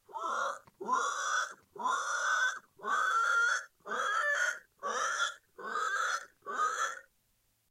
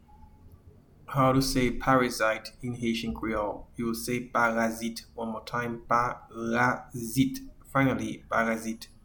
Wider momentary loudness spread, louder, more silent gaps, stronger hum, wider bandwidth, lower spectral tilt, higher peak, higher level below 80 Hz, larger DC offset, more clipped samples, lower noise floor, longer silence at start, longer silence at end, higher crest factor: about the same, 11 LU vs 11 LU; second, -33 LUFS vs -29 LUFS; neither; neither; second, 16 kHz vs 19 kHz; second, 1 dB/octave vs -5 dB/octave; second, -20 dBFS vs -10 dBFS; second, -84 dBFS vs -48 dBFS; neither; neither; first, -75 dBFS vs -55 dBFS; second, 0.1 s vs 0.45 s; first, 0.7 s vs 0.2 s; about the same, 16 dB vs 20 dB